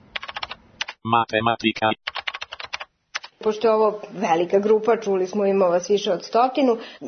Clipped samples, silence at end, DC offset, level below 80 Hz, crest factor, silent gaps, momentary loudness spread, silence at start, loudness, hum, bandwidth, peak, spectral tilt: under 0.1%; 0 s; under 0.1%; -62 dBFS; 16 dB; none; 14 LU; 0.15 s; -22 LUFS; none; 6.6 kHz; -6 dBFS; -5 dB/octave